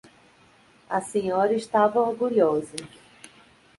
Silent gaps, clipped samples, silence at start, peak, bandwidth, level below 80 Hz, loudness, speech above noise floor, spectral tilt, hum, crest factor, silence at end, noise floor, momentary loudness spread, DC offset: none; under 0.1%; 0.9 s; -8 dBFS; 11.5 kHz; -66 dBFS; -24 LUFS; 33 dB; -5.5 dB/octave; none; 18 dB; 0.9 s; -57 dBFS; 9 LU; under 0.1%